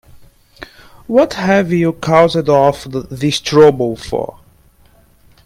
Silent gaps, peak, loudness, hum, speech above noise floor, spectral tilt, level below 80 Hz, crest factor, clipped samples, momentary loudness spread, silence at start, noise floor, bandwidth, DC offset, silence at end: none; 0 dBFS; -13 LUFS; none; 36 dB; -6 dB/octave; -44 dBFS; 14 dB; under 0.1%; 12 LU; 0.15 s; -49 dBFS; 15.5 kHz; under 0.1%; 1.2 s